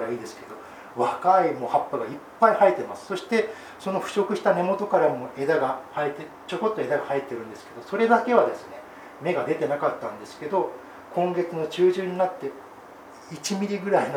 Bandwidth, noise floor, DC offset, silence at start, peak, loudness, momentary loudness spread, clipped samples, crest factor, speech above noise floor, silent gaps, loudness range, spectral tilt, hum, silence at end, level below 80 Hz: 17.5 kHz; -45 dBFS; under 0.1%; 0 s; -4 dBFS; -25 LUFS; 19 LU; under 0.1%; 22 dB; 21 dB; none; 4 LU; -5.5 dB/octave; none; 0 s; -70 dBFS